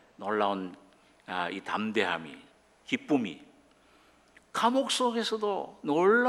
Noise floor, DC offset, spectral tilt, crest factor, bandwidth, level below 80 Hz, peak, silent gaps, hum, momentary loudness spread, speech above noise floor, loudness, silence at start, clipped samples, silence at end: -62 dBFS; under 0.1%; -4 dB/octave; 20 dB; 14 kHz; -76 dBFS; -12 dBFS; none; none; 14 LU; 33 dB; -30 LUFS; 0.2 s; under 0.1%; 0 s